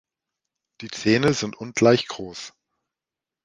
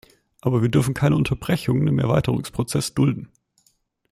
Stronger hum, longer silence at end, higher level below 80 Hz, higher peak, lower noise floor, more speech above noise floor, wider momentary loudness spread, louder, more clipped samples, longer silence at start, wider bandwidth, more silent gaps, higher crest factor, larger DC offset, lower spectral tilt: neither; about the same, 0.95 s vs 0.85 s; second, -58 dBFS vs -46 dBFS; about the same, -4 dBFS vs -6 dBFS; first, -89 dBFS vs -65 dBFS; first, 67 dB vs 45 dB; first, 19 LU vs 5 LU; about the same, -21 LUFS vs -21 LUFS; neither; first, 0.8 s vs 0.45 s; second, 11 kHz vs 14.5 kHz; neither; first, 22 dB vs 16 dB; neither; second, -5 dB/octave vs -6.5 dB/octave